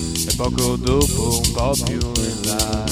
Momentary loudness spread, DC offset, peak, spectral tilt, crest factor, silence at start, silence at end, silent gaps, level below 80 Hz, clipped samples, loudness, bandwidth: 3 LU; under 0.1%; -2 dBFS; -4 dB/octave; 16 dB; 0 s; 0 s; none; -28 dBFS; under 0.1%; -19 LUFS; over 20 kHz